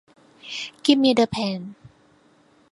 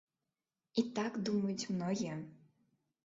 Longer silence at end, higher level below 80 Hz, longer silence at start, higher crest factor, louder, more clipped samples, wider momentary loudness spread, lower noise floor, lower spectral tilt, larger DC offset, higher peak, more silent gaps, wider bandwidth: first, 1 s vs 0.7 s; first, -60 dBFS vs -78 dBFS; second, 0.45 s vs 0.75 s; about the same, 22 dB vs 20 dB; first, -21 LUFS vs -38 LUFS; neither; first, 20 LU vs 7 LU; second, -58 dBFS vs under -90 dBFS; about the same, -5 dB/octave vs -6 dB/octave; neither; first, -2 dBFS vs -20 dBFS; neither; first, 11.5 kHz vs 7.6 kHz